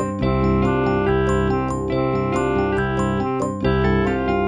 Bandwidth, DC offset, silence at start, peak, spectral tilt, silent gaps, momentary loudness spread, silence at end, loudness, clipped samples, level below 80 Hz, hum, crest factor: 9.8 kHz; 0.3%; 0 s; -6 dBFS; -7.5 dB/octave; none; 3 LU; 0 s; -20 LUFS; under 0.1%; -32 dBFS; none; 14 dB